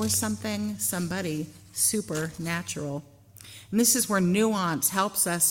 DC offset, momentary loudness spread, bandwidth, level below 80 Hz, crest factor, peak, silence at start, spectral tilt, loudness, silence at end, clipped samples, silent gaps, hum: under 0.1%; 13 LU; 17 kHz; -60 dBFS; 18 dB; -8 dBFS; 0 s; -3.5 dB/octave; -26 LUFS; 0 s; under 0.1%; none; none